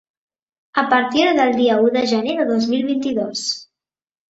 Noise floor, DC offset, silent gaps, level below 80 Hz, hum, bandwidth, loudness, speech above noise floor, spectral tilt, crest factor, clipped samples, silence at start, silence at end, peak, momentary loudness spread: -83 dBFS; under 0.1%; none; -62 dBFS; none; 8 kHz; -18 LUFS; 66 dB; -4 dB/octave; 16 dB; under 0.1%; 0.75 s; 0.65 s; -2 dBFS; 8 LU